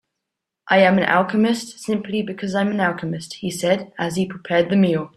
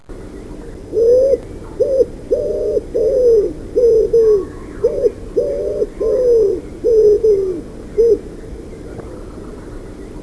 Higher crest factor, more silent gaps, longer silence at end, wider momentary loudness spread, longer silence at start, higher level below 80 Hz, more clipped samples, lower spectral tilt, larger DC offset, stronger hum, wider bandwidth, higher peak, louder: about the same, 18 dB vs 14 dB; neither; about the same, 0.1 s vs 0 s; second, 10 LU vs 21 LU; first, 0.65 s vs 0.1 s; second, -60 dBFS vs -34 dBFS; neither; second, -5.5 dB/octave vs -7.5 dB/octave; second, under 0.1% vs 0.3%; neither; first, 14 kHz vs 11 kHz; about the same, -2 dBFS vs -2 dBFS; second, -20 LUFS vs -15 LUFS